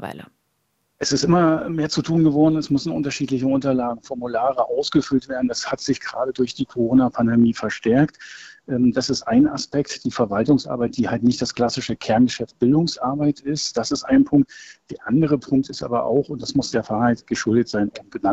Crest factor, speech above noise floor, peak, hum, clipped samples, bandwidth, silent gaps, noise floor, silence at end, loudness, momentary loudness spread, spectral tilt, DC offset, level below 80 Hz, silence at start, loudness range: 14 dB; 50 dB; -6 dBFS; none; under 0.1%; 8.2 kHz; none; -70 dBFS; 0 s; -20 LUFS; 8 LU; -5.5 dB/octave; under 0.1%; -52 dBFS; 0 s; 2 LU